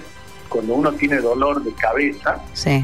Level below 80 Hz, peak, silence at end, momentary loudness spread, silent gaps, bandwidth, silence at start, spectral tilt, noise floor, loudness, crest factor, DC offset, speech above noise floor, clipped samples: -42 dBFS; -6 dBFS; 0 s; 8 LU; none; 14 kHz; 0 s; -6 dB/octave; -40 dBFS; -20 LUFS; 14 dB; 1%; 21 dB; under 0.1%